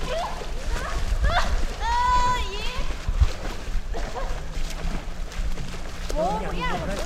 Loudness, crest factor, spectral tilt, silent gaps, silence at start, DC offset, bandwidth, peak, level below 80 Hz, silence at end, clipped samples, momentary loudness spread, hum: -28 LUFS; 16 dB; -4.5 dB/octave; none; 0 s; under 0.1%; 13.5 kHz; -8 dBFS; -26 dBFS; 0 s; under 0.1%; 11 LU; none